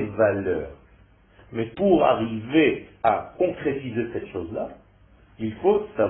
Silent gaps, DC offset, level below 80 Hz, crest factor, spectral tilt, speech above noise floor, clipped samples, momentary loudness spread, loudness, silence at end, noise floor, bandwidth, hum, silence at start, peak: none; under 0.1%; -52 dBFS; 20 dB; -11 dB/octave; 32 dB; under 0.1%; 13 LU; -24 LUFS; 0 s; -55 dBFS; 4 kHz; none; 0 s; -6 dBFS